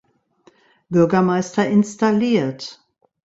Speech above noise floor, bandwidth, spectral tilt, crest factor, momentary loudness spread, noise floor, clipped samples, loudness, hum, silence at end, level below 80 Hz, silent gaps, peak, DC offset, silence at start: 39 dB; 8 kHz; -6.5 dB/octave; 16 dB; 10 LU; -56 dBFS; under 0.1%; -18 LUFS; none; 0.55 s; -60 dBFS; none; -4 dBFS; under 0.1%; 0.9 s